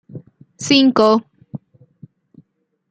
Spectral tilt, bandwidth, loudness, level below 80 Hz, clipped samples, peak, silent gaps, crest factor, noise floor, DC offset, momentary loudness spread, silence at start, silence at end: -4 dB/octave; 9.2 kHz; -14 LUFS; -64 dBFS; under 0.1%; -2 dBFS; none; 18 dB; -64 dBFS; under 0.1%; 25 LU; 0.15 s; 1.35 s